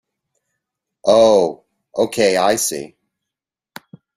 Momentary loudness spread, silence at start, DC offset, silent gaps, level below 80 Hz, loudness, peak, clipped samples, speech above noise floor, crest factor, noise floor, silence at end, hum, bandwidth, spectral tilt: 17 LU; 1.05 s; under 0.1%; none; -58 dBFS; -16 LUFS; -2 dBFS; under 0.1%; 71 dB; 18 dB; -85 dBFS; 1.3 s; none; 15.5 kHz; -3 dB/octave